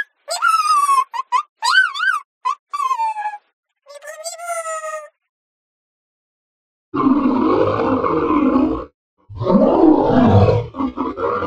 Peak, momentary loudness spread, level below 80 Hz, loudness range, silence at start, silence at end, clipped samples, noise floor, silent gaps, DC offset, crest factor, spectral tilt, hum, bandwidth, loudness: 0 dBFS; 15 LU; -44 dBFS; 14 LU; 0 s; 0 s; under 0.1%; -37 dBFS; 1.49-1.56 s, 2.25-2.41 s, 2.59-2.67 s, 3.53-3.63 s, 5.29-6.92 s, 8.94-9.17 s; under 0.1%; 18 dB; -5.5 dB/octave; none; 14.5 kHz; -17 LUFS